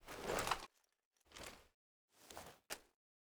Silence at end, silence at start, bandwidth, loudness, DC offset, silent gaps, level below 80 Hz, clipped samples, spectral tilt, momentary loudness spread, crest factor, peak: 0.4 s; 0 s; over 20 kHz; -47 LUFS; under 0.1%; 1.05-1.11 s, 1.74-2.08 s; -66 dBFS; under 0.1%; -2.5 dB/octave; 18 LU; 28 dB; -22 dBFS